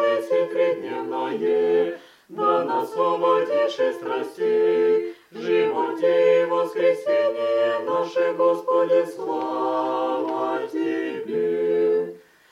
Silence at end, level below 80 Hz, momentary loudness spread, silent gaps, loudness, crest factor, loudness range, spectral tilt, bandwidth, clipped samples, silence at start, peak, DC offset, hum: 0.35 s; -80 dBFS; 8 LU; none; -22 LUFS; 14 dB; 3 LU; -5.5 dB/octave; 12 kHz; under 0.1%; 0 s; -8 dBFS; under 0.1%; none